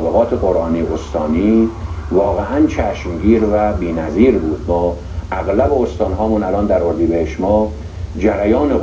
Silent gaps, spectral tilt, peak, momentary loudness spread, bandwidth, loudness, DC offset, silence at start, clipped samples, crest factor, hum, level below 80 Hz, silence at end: none; -8.5 dB/octave; 0 dBFS; 7 LU; 7.6 kHz; -16 LUFS; under 0.1%; 0 s; under 0.1%; 14 dB; none; -28 dBFS; 0 s